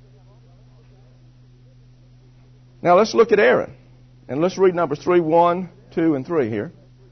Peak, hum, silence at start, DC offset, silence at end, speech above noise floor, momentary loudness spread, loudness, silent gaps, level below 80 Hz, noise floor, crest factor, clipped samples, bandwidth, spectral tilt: -2 dBFS; none; 2.8 s; under 0.1%; 0.4 s; 31 dB; 14 LU; -19 LUFS; none; -56 dBFS; -49 dBFS; 20 dB; under 0.1%; 6.4 kHz; -6.5 dB/octave